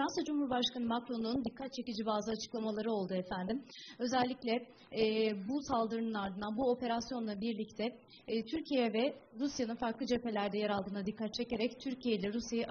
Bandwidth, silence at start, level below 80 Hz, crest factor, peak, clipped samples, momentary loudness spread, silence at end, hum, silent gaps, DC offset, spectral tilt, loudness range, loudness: 6.8 kHz; 0 s; -66 dBFS; 18 dB; -20 dBFS; under 0.1%; 6 LU; 0 s; none; none; under 0.1%; -4 dB/octave; 2 LU; -37 LUFS